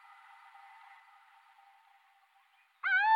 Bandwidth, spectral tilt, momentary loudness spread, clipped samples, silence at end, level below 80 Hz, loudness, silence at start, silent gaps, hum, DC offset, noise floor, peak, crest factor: 10 kHz; 5 dB/octave; 28 LU; under 0.1%; 0 s; under -90 dBFS; -31 LUFS; 2.85 s; none; none; under 0.1%; -68 dBFS; -16 dBFS; 20 dB